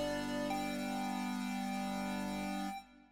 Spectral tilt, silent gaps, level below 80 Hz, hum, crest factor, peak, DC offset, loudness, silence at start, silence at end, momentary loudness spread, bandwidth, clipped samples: -5 dB/octave; none; -60 dBFS; 50 Hz at -65 dBFS; 12 dB; -26 dBFS; under 0.1%; -39 LUFS; 0 s; 0 s; 3 LU; 17 kHz; under 0.1%